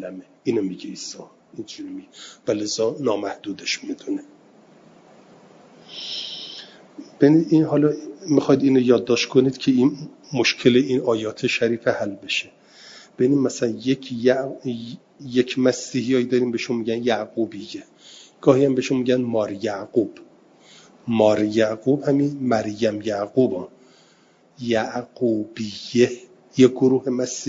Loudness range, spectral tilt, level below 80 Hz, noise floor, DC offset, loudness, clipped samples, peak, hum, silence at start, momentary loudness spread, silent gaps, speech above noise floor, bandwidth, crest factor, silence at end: 8 LU; -5.5 dB/octave; -66 dBFS; -56 dBFS; under 0.1%; -21 LUFS; under 0.1%; -2 dBFS; none; 0 s; 17 LU; none; 35 dB; 7.8 kHz; 20 dB; 0 s